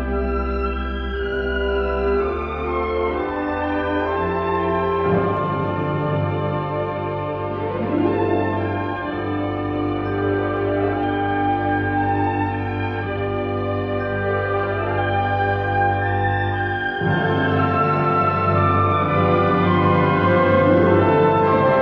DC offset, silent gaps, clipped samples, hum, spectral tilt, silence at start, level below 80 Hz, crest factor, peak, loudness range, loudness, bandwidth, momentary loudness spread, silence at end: under 0.1%; none; under 0.1%; none; -9.5 dB/octave; 0 s; -36 dBFS; 16 dB; -4 dBFS; 6 LU; -20 LUFS; 5.6 kHz; 8 LU; 0 s